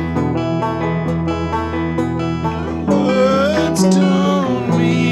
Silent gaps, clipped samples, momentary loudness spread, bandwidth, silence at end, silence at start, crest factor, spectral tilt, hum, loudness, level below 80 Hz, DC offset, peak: none; under 0.1%; 6 LU; 12.5 kHz; 0 s; 0 s; 12 dB; -6.5 dB/octave; none; -17 LUFS; -36 dBFS; under 0.1%; -2 dBFS